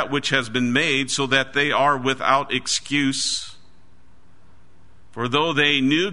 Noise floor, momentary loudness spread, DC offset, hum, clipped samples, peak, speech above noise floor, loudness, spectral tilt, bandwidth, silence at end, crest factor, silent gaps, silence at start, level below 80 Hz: -55 dBFS; 6 LU; 1%; none; under 0.1%; -2 dBFS; 35 dB; -20 LUFS; -3 dB/octave; 11 kHz; 0 s; 20 dB; none; 0 s; -56 dBFS